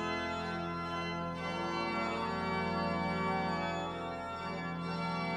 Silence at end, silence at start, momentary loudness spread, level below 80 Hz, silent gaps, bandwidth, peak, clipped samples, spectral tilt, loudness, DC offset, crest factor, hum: 0 s; 0 s; 5 LU; -60 dBFS; none; 9.8 kHz; -22 dBFS; under 0.1%; -6 dB/octave; -36 LUFS; under 0.1%; 14 dB; none